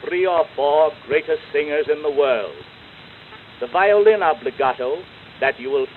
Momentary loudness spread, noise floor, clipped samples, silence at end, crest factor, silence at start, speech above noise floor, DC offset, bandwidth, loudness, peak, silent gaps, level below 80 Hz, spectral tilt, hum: 17 LU; -42 dBFS; under 0.1%; 0 s; 16 dB; 0 s; 23 dB; under 0.1%; 4.3 kHz; -19 LUFS; -4 dBFS; none; -60 dBFS; -7 dB/octave; none